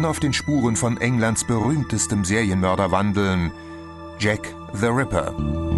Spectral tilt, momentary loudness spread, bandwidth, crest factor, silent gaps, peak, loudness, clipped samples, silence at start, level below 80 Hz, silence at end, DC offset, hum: -5 dB/octave; 8 LU; 12 kHz; 16 dB; none; -6 dBFS; -21 LUFS; under 0.1%; 0 s; -38 dBFS; 0 s; under 0.1%; none